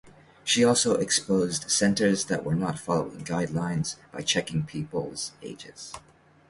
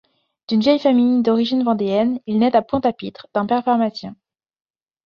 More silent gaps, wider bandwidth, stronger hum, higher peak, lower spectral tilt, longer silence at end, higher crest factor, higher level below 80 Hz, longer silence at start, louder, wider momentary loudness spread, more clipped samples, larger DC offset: neither; first, 11.5 kHz vs 6.8 kHz; neither; second, -8 dBFS vs -4 dBFS; second, -3.5 dB/octave vs -7.5 dB/octave; second, 0.5 s vs 0.9 s; about the same, 18 dB vs 16 dB; about the same, -58 dBFS vs -58 dBFS; second, 0.05 s vs 0.5 s; second, -26 LUFS vs -18 LUFS; first, 18 LU vs 9 LU; neither; neither